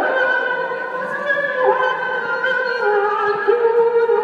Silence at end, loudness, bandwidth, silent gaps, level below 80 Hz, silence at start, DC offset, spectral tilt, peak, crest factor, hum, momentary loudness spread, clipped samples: 0 s; -18 LUFS; 6.8 kHz; none; -74 dBFS; 0 s; under 0.1%; -4.5 dB/octave; -2 dBFS; 16 dB; none; 6 LU; under 0.1%